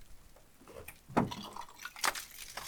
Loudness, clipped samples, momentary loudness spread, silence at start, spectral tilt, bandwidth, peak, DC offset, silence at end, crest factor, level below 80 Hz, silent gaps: -37 LUFS; under 0.1%; 16 LU; 0 s; -3.5 dB/octave; over 20 kHz; -14 dBFS; under 0.1%; 0 s; 26 dB; -60 dBFS; none